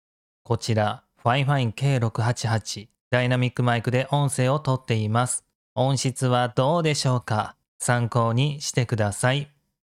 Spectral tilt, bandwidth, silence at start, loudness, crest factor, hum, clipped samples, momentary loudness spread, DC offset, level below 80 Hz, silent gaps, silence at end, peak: -5 dB/octave; 13 kHz; 0.5 s; -24 LUFS; 16 dB; none; under 0.1%; 6 LU; under 0.1%; -60 dBFS; 3.01-3.11 s, 5.55-5.76 s, 7.68-7.79 s; 0.55 s; -6 dBFS